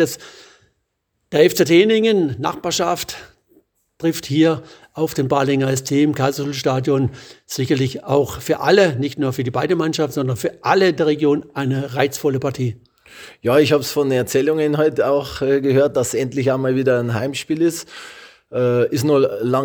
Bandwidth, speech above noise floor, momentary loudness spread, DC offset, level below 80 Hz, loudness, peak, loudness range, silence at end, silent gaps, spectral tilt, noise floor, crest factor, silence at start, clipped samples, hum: over 20 kHz; 54 dB; 10 LU; under 0.1%; -56 dBFS; -18 LUFS; 0 dBFS; 2 LU; 0 s; none; -5.5 dB/octave; -72 dBFS; 18 dB; 0 s; under 0.1%; none